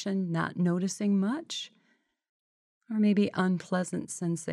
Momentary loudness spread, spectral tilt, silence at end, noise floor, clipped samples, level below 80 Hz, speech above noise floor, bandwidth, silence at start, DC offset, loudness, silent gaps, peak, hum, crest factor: 9 LU; -6 dB/octave; 0 s; -72 dBFS; under 0.1%; -76 dBFS; 43 dB; 12 kHz; 0 s; under 0.1%; -30 LUFS; 2.29-2.81 s; -16 dBFS; none; 14 dB